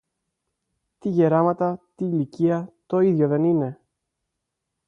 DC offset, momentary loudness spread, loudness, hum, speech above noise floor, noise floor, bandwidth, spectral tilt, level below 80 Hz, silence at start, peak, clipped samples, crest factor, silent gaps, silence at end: under 0.1%; 9 LU; -22 LUFS; none; 60 dB; -81 dBFS; 6.6 kHz; -10.5 dB/octave; -68 dBFS; 1.05 s; -8 dBFS; under 0.1%; 16 dB; none; 1.15 s